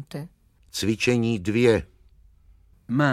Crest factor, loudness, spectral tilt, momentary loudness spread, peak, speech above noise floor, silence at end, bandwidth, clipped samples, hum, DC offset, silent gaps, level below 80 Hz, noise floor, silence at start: 18 dB; -23 LUFS; -5.5 dB/octave; 17 LU; -6 dBFS; 33 dB; 0 s; 15.5 kHz; under 0.1%; none; under 0.1%; none; -50 dBFS; -55 dBFS; 0 s